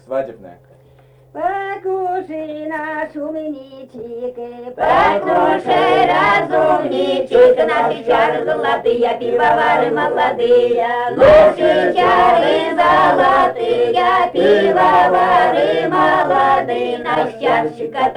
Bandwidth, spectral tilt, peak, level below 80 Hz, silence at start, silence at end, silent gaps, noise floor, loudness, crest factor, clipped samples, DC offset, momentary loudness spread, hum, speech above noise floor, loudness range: 10.5 kHz; -5.5 dB/octave; -2 dBFS; -46 dBFS; 0.1 s; 0 s; none; -47 dBFS; -14 LUFS; 14 dB; under 0.1%; under 0.1%; 13 LU; none; 33 dB; 11 LU